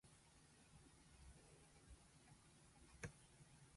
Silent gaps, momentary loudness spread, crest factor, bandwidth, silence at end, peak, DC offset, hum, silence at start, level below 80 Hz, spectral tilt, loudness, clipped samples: none; 11 LU; 26 dB; 11.5 kHz; 0 s; -38 dBFS; under 0.1%; none; 0.05 s; -72 dBFS; -4 dB/octave; -65 LUFS; under 0.1%